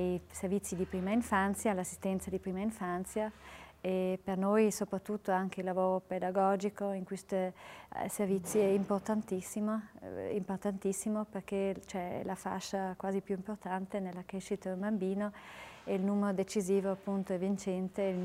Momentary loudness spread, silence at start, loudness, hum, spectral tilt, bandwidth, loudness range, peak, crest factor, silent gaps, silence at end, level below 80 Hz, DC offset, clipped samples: 9 LU; 0 s; -35 LUFS; none; -6 dB/octave; 16 kHz; 4 LU; -16 dBFS; 18 dB; none; 0 s; -66 dBFS; under 0.1%; under 0.1%